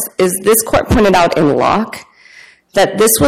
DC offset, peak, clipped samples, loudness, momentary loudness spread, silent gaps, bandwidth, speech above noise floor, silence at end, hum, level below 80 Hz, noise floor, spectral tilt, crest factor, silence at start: under 0.1%; 0 dBFS; under 0.1%; -12 LUFS; 8 LU; none; 16.5 kHz; 30 dB; 0 s; none; -32 dBFS; -42 dBFS; -4 dB/octave; 12 dB; 0 s